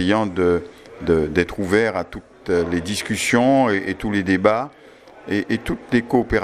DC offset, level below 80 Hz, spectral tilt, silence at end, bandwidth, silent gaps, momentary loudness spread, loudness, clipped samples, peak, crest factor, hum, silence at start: under 0.1%; -42 dBFS; -5.5 dB/octave; 0 s; 15 kHz; none; 11 LU; -20 LUFS; under 0.1%; 0 dBFS; 20 dB; none; 0 s